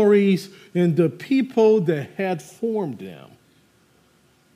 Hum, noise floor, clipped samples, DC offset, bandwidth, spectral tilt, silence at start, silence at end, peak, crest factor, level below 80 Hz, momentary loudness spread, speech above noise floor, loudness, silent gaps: none; -59 dBFS; under 0.1%; under 0.1%; 15 kHz; -7.5 dB/octave; 0 s; 1.4 s; -6 dBFS; 16 dB; -72 dBFS; 11 LU; 39 dB; -21 LUFS; none